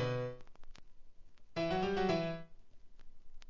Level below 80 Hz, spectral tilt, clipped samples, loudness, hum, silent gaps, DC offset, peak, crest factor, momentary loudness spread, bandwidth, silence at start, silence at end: -58 dBFS; -6.5 dB/octave; under 0.1%; -37 LUFS; none; none; 0.2%; -20 dBFS; 18 dB; 13 LU; 7.6 kHz; 0 s; 0 s